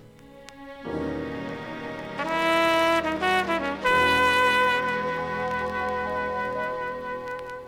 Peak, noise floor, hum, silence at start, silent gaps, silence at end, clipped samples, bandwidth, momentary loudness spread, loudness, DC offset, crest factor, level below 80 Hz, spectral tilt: -8 dBFS; -47 dBFS; none; 0 s; none; 0 s; under 0.1%; 17.5 kHz; 15 LU; -25 LUFS; under 0.1%; 16 dB; -52 dBFS; -4 dB/octave